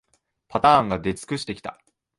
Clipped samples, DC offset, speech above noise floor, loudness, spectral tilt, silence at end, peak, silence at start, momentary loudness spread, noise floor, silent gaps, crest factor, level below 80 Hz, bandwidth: under 0.1%; under 0.1%; 41 dB; -22 LUFS; -5 dB/octave; 0.45 s; -4 dBFS; 0.5 s; 16 LU; -63 dBFS; none; 20 dB; -52 dBFS; 11.5 kHz